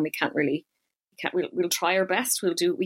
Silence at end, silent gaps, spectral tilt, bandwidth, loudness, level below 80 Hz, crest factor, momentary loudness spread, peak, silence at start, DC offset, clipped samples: 0 s; none; -3 dB/octave; 16.5 kHz; -26 LUFS; -74 dBFS; 20 dB; 6 LU; -8 dBFS; 0 s; under 0.1%; under 0.1%